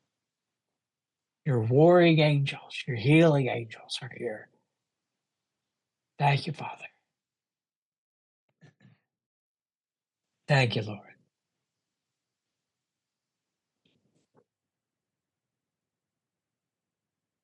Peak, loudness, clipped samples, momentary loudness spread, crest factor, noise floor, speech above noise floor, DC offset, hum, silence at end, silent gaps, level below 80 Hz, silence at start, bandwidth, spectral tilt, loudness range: -10 dBFS; -25 LUFS; under 0.1%; 19 LU; 20 dB; under -90 dBFS; over 65 dB; under 0.1%; none; 6.45 s; 7.76-7.92 s, 7.98-8.49 s, 9.26-9.55 s, 9.75-9.84 s; -72 dBFS; 1.45 s; 10.5 kHz; -7 dB/octave; 11 LU